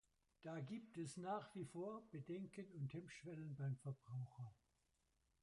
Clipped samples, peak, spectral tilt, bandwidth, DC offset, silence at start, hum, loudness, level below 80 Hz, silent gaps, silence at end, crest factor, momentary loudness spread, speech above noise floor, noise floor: under 0.1%; -36 dBFS; -7 dB/octave; 11 kHz; under 0.1%; 0.4 s; none; -52 LUFS; -84 dBFS; none; 0.9 s; 16 dB; 7 LU; 34 dB; -85 dBFS